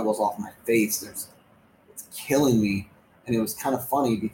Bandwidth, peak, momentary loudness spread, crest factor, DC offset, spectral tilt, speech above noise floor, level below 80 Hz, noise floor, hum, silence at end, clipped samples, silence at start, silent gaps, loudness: 17 kHz; -10 dBFS; 18 LU; 16 dB; under 0.1%; -5 dB/octave; 33 dB; -58 dBFS; -58 dBFS; none; 0 s; under 0.1%; 0 s; none; -25 LUFS